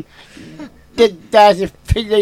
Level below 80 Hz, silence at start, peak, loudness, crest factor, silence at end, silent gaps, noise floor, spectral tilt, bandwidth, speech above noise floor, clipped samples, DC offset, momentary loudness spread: -32 dBFS; 0.6 s; 0 dBFS; -13 LUFS; 14 dB; 0 s; none; -35 dBFS; -5.5 dB/octave; 16 kHz; 22 dB; under 0.1%; under 0.1%; 22 LU